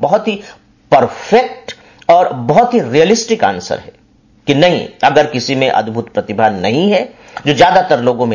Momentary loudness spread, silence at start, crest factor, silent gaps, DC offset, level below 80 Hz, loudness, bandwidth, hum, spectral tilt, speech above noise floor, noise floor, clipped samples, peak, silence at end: 11 LU; 0 s; 12 dB; none; under 0.1%; -48 dBFS; -12 LUFS; 7.4 kHz; none; -5 dB/octave; 37 dB; -49 dBFS; under 0.1%; 0 dBFS; 0 s